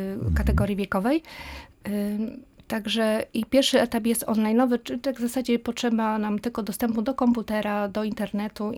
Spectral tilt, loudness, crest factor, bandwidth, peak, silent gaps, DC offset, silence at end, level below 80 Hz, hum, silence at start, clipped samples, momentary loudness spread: -5.5 dB/octave; -25 LUFS; 16 dB; 18 kHz; -8 dBFS; none; under 0.1%; 0 s; -38 dBFS; none; 0 s; under 0.1%; 9 LU